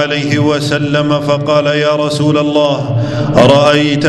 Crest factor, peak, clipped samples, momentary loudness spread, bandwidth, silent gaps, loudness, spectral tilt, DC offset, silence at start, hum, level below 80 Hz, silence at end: 10 dB; 0 dBFS; 0.3%; 6 LU; 12 kHz; none; -11 LUFS; -6 dB/octave; under 0.1%; 0 s; none; -42 dBFS; 0 s